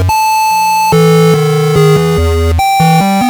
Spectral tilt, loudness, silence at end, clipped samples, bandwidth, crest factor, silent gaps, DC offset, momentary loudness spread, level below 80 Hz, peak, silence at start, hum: -5.5 dB/octave; -9 LUFS; 0 s; under 0.1%; over 20 kHz; 8 dB; none; under 0.1%; 4 LU; -24 dBFS; 0 dBFS; 0 s; none